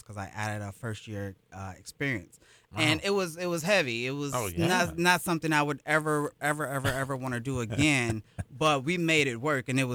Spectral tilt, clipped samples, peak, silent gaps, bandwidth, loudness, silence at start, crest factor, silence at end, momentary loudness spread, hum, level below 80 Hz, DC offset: -4.5 dB/octave; under 0.1%; -10 dBFS; none; over 20 kHz; -28 LUFS; 0.1 s; 20 dB; 0 s; 14 LU; none; -56 dBFS; under 0.1%